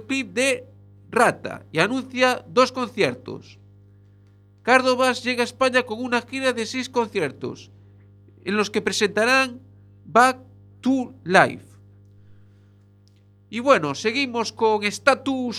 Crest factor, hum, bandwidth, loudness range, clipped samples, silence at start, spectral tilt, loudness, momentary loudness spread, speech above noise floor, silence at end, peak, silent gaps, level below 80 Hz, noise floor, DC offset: 22 dB; 50 Hz at -50 dBFS; 14.5 kHz; 4 LU; under 0.1%; 0 s; -3.5 dB/octave; -21 LUFS; 12 LU; 32 dB; 0 s; 0 dBFS; none; -66 dBFS; -54 dBFS; under 0.1%